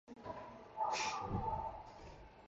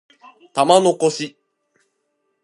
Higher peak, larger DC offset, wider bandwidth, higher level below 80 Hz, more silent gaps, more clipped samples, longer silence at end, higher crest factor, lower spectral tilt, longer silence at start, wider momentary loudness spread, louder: second, -26 dBFS vs 0 dBFS; neither; second, 8.8 kHz vs 11.5 kHz; first, -58 dBFS vs -74 dBFS; neither; neither; second, 0 s vs 1.15 s; about the same, 16 dB vs 20 dB; about the same, -4 dB/octave vs -4 dB/octave; second, 0.05 s vs 0.55 s; first, 17 LU vs 14 LU; second, -42 LUFS vs -17 LUFS